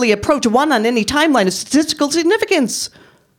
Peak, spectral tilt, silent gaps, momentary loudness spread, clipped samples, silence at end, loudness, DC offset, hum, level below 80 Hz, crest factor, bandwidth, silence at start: -2 dBFS; -3.5 dB/octave; none; 3 LU; under 0.1%; 0.5 s; -15 LUFS; under 0.1%; none; -46 dBFS; 14 dB; 17 kHz; 0 s